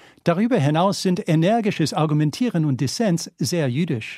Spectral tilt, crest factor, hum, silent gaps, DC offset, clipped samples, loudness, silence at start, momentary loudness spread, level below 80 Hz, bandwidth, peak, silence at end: -6 dB/octave; 16 dB; none; none; under 0.1%; under 0.1%; -21 LUFS; 0.25 s; 4 LU; -62 dBFS; 14.5 kHz; -4 dBFS; 0 s